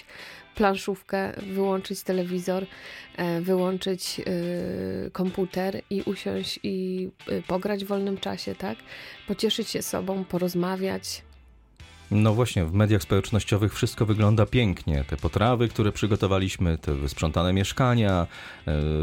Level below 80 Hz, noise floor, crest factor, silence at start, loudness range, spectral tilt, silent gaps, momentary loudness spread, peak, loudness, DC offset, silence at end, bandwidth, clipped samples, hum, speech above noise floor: -42 dBFS; -53 dBFS; 18 dB; 0.1 s; 6 LU; -6 dB/octave; none; 10 LU; -8 dBFS; -26 LUFS; under 0.1%; 0 s; 17 kHz; under 0.1%; none; 27 dB